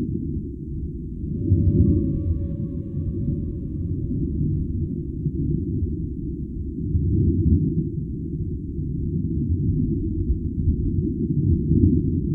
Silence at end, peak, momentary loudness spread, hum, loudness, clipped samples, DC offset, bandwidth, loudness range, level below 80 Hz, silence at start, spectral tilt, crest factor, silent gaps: 0 s; -4 dBFS; 10 LU; none; -24 LUFS; under 0.1%; under 0.1%; 1.2 kHz; 3 LU; -30 dBFS; 0 s; -15 dB/octave; 20 dB; none